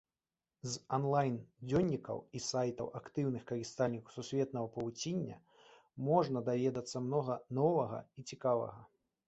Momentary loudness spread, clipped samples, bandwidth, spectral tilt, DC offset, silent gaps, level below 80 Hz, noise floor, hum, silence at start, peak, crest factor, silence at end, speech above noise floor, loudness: 11 LU; under 0.1%; 8.2 kHz; -6 dB/octave; under 0.1%; none; -68 dBFS; under -90 dBFS; none; 0.65 s; -16 dBFS; 20 dB; 0.4 s; over 54 dB; -37 LUFS